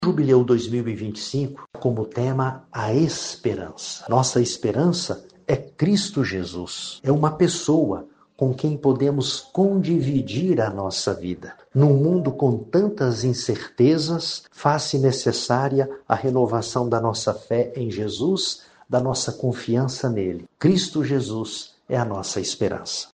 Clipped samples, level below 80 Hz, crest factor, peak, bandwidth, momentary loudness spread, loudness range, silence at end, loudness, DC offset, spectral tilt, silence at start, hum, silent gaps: under 0.1%; -56 dBFS; 20 dB; -2 dBFS; 9.6 kHz; 9 LU; 3 LU; 0.1 s; -22 LUFS; under 0.1%; -5.5 dB/octave; 0 s; none; none